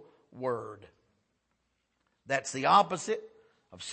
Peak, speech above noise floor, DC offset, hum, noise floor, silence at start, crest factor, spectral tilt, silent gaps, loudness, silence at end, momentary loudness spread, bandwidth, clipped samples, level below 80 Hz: -8 dBFS; 49 dB; under 0.1%; none; -78 dBFS; 0.35 s; 26 dB; -3.5 dB/octave; none; -29 LUFS; 0 s; 15 LU; 8.8 kHz; under 0.1%; -78 dBFS